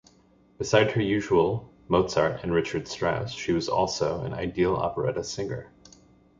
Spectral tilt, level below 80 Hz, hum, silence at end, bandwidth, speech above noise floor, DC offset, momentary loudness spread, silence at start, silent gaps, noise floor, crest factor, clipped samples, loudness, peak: -5.5 dB/octave; -50 dBFS; none; 0.75 s; 7.8 kHz; 34 dB; under 0.1%; 9 LU; 0.6 s; none; -59 dBFS; 20 dB; under 0.1%; -26 LUFS; -6 dBFS